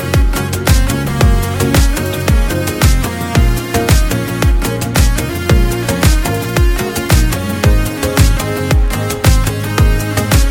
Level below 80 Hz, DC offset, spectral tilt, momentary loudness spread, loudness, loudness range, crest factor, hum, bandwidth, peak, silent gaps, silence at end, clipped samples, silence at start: -14 dBFS; 0.3%; -5 dB/octave; 3 LU; -14 LUFS; 1 LU; 12 dB; none; 17.5 kHz; 0 dBFS; none; 0 s; 0.1%; 0 s